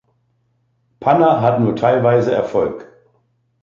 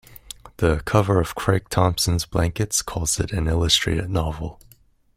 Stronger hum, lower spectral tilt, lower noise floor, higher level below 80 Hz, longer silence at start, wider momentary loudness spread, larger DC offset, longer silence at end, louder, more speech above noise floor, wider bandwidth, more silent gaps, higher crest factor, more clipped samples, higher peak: neither; first, -8.5 dB/octave vs -4.5 dB/octave; first, -64 dBFS vs -42 dBFS; second, -54 dBFS vs -36 dBFS; first, 1 s vs 0.1 s; second, 9 LU vs 13 LU; neither; first, 0.8 s vs 0.6 s; first, -15 LUFS vs -21 LUFS; first, 49 dB vs 21 dB; second, 7.4 kHz vs 16 kHz; neither; about the same, 16 dB vs 20 dB; neither; about the same, -2 dBFS vs -2 dBFS